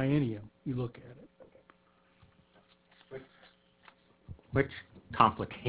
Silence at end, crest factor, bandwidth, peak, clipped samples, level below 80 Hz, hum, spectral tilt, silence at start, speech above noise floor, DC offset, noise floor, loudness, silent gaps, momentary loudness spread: 0 s; 28 dB; 4 kHz; -8 dBFS; under 0.1%; -60 dBFS; none; -5.5 dB/octave; 0 s; 36 dB; under 0.1%; -67 dBFS; -32 LUFS; none; 26 LU